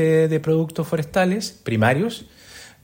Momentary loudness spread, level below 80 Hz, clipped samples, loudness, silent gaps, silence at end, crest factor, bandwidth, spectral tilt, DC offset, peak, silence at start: 15 LU; -54 dBFS; under 0.1%; -21 LUFS; none; 0.15 s; 16 dB; 16.5 kHz; -6.5 dB/octave; under 0.1%; -4 dBFS; 0 s